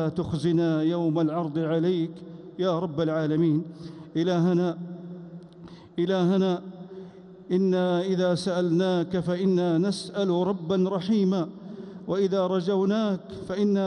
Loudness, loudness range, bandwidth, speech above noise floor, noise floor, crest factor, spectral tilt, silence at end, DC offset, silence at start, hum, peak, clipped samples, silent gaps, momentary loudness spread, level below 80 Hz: -26 LUFS; 3 LU; 10.5 kHz; 22 dB; -46 dBFS; 12 dB; -7.5 dB/octave; 0 s; under 0.1%; 0 s; none; -14 dBFS; under 0.1%; none; 17 LU; -64 dBFS